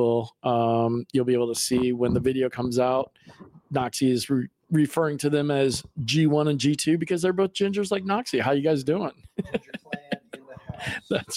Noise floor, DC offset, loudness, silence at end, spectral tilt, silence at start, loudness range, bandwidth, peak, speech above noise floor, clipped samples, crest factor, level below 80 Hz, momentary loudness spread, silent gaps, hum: -44 dBFS; under 0.1%; -25 LUFS; 0 s; -5.5 dB/octave; 0 s; 3 LU; 16 kHz; -10 dBFS; 20 dB; under 0.1%; 16 dB; -56 dBFS; 11 LU; none; none